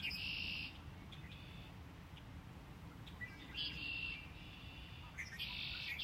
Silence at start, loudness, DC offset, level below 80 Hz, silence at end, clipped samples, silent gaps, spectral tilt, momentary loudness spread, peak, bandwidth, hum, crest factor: 0 s; -47 LUFS; under 0.1%; -60 dBFS; 0 s; under 0.1%; none; -3.5 dB/octave; 14 LU; -30 dBFS; 16 kHz; none; 18 dB